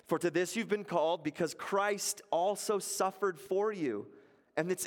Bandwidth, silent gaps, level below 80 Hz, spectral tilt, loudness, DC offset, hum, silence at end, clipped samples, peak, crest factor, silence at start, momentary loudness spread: 17 kHz; none; -82 dBFS; -3.5 dB/octave; -34 LUFS; under 0.1%; none; 0 s; under 0.1%; -16 dBFS; 18 dB; 0.1 s; 6 LU